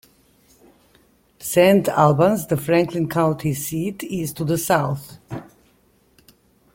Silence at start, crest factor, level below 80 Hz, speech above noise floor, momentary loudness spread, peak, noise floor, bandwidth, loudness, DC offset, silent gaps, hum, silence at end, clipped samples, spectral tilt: 1.4 s; 20 dB; -54 dBFS; 40 dB; 17 LU; -2 dBFS; -59 dBFS; 17 kHz; -19 LUFS; under 0.1%; none; none; 1.3 s; under 0.1%; -6 dB/octave